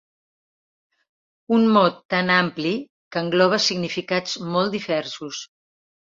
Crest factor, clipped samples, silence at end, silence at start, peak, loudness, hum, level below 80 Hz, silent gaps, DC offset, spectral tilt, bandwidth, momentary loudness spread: 20 dB; under 0.1%; 0.6 s; 1.5 s; -2 dBFS; -21 LUFS; none; -66 dBFS; 2.05-2.09 s, 2.90-3.11 s; under 0.1%; -4.5 dB/octave; 7.6 kHz; 13 LU